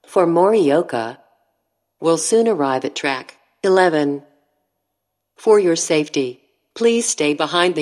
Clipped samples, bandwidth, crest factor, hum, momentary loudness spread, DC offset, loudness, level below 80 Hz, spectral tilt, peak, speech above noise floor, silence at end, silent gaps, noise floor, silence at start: under 0.1%; 13 kHz; 18 dB; none; 9 LU; under 0.1%; -17 LUFS; -78 dBFS; -3.5 dB/octave; 0 dBFS; 60 dB; 0 s; none; -76 dBFS; 0.1 s